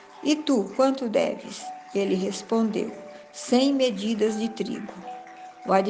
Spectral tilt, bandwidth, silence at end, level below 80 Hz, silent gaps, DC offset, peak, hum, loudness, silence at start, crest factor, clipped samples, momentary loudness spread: -5 dB/octave; 9.8 kHz; 0 s; -70 dBFS; none; under 0.1%; -8 dBFS; none; -25 LUFS; 0 s; 18 dB; under 0.1%; 16 LU